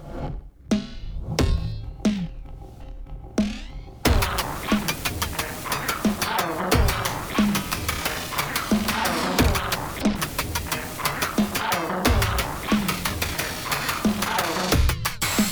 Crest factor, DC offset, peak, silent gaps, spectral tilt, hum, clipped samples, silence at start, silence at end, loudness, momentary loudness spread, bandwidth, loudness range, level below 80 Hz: 22 dB; under 0.1%; -2 dBFS; none; -4 dB/octave; none; under 0.1%; 0 s; 0 s; -24 LUFS; 13 LU; over 20 kHz; 4 LU; -32 dBFS